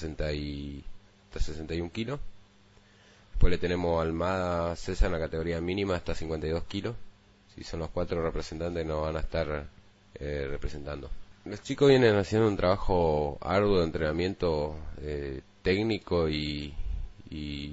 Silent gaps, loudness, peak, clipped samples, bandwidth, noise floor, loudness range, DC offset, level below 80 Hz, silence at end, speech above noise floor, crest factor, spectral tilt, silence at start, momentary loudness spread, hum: none; -30 LUFS; -6 dBFS; under 0.1%; 8 kHz; -59 dBFS; 9 LU; under 0.1%; -38 dBFS; 0 s; 30 dB; 22 dB; -6.5 dB/octave; 0 s; 15 LU; none